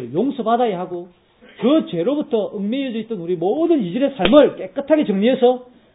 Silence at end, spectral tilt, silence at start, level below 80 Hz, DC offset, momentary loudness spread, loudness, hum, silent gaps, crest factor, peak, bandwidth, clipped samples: 0.3 s; -10 dB/octave; 0 s; -52 dBFS; under 0.1%; 12 LU; -18 LUFS; none; none; 18 dB; 0 dBFS; 4 kHz; under 0.1%